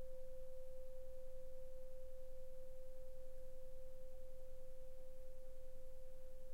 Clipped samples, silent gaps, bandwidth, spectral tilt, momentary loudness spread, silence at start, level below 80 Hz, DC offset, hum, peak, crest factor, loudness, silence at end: under 0.1%; none; 1.9 kHz; -6 dB/octave; 3 LU; 0 s; -54 dBFS; under 0.1%; none; -38 dBFS; 6 dB; -59 LUFS; 0 s